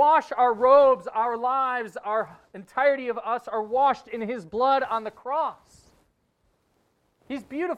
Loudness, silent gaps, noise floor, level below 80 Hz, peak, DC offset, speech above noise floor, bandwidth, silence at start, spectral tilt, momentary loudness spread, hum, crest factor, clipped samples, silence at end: -24 LUFS; none; -70 dBFS; -68 dBFS; -6 dBFS; under 0.1%; 46 dB; 9.2 kHz; 0 s; -5.5 dB/octave; 14 LU; none; 18 dB; under 0.1%; 0 s